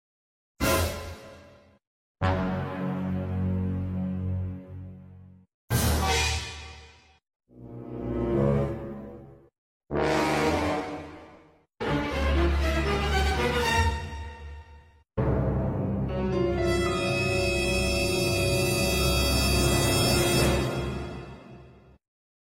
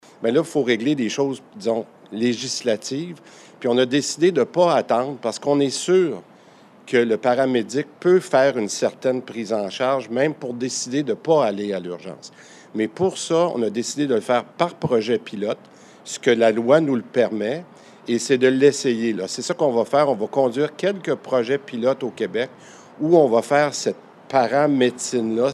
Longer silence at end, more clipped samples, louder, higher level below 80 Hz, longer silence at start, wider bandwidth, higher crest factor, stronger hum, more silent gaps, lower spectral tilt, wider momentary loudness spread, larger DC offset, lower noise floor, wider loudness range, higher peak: first, 0.85 s vs 0 s; neither; second, -26 LUFS vs -21 LUFS; first, -36 dBFS vs -72 dBFS; first, 0.6 s vs 0.2 s; first, 16.5 kHz vs 13 kHz; about the same, 18 dB vs 18 dB; neither; first, 1.87-2.15 s, 5.54-5.68 s, 7.36-7.40 s, 9.58-9.81 s vs none; about the same, -4.5 dB/octave vs -4.5 dB/octave; first, 19 LU vs 10 LU; neither; first, -56 dBFS vs -49 dBFS; first, 7 LU vs 3 LU; second, -10 dBFS vs -2 dBFS